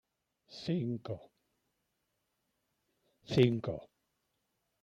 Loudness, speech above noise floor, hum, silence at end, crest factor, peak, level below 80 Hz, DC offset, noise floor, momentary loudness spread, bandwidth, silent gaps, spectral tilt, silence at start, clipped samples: -34 LUFS; 50 dB; none; 0.95 s; 24 dB; -14 dBFS; -68 dBFS; under 0.1%; -82 dBFS; 17 LU; 9 kHz; none; -7.5 dB/octave; 0.5 s; under 0.1%